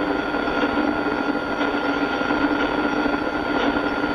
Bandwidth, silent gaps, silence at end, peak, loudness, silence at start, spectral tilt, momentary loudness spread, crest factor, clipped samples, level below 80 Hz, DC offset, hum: 10.5 kHz; none; 0 s; -8 dBFS; -22 LUFS; 0 s; -5.5 dB/octave; 2 LU; 14 dB; under 0.1%; -44 dBFS; under 0.1%; none